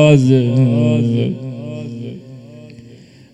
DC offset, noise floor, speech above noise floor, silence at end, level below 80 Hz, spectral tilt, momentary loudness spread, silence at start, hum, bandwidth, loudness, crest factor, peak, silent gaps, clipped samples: under 0.1%; -41 dBFS; 29 dB; 0.4 s; -52 dBFS; -8 dB/octave; 24 LU; 0 s; none; 8.8 kHz; -15 LUFS; 16 dB; 0 dBFS; none; under 0.1%